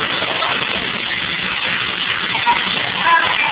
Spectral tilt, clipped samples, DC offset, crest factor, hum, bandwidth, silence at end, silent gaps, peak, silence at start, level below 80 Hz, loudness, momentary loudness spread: 0.5 dB/octave; under 0.1%; under 0.1%; 18 dB; none; 4 kHz; 0 s; none; 0 dBFS; 0 s; -48 dBFS; -16 LUFS; 5 LU